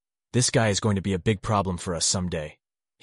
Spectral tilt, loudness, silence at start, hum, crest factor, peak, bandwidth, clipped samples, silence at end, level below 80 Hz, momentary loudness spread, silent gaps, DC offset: -4 dB/octave; -25 LUFS; 0.35 s; none; 16 dB; -10 dBFS; 11.5 kHz; under 0.1%; 0.5 s; -48 dBFS; 9 LU; none; under 0.1%